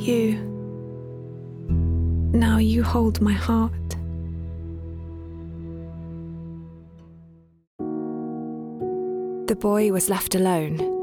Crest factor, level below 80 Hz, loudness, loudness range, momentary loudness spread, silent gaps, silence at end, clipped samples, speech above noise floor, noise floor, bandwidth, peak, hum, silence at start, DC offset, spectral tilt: 16 dB; -38 dBFS; -24 LUFS; 13 LU; 16 LU; 7.67-7.79 s; 0 s; under 0.1%; 30 dB; -50 dBFS; 19.5 kHz; -8 dBFS; none; 0 s; under 0.1%; -6 dB/octave